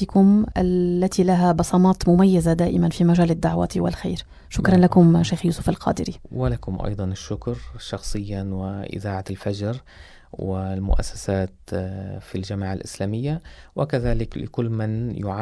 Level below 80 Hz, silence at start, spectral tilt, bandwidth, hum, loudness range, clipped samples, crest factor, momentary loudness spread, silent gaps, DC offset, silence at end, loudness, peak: -34 dBFS; 0 s; -7.5 dB/octave; 11 kHz; none; 10 LU; under 0.1%; 18 dB; 14 LU; none; under 0.1%; 0 s; -22 LUFS; -2 dBFS